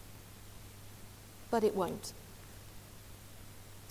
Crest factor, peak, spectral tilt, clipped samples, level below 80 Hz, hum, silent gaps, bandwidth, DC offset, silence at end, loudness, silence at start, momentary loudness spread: 22 dB; -18 dBFS; -5 dB/octave; under 0.1%; -60 dBFS; none; none; 16 kHz; under 0.1%; 0 s; -35 LUFS; 0 s; 20 LU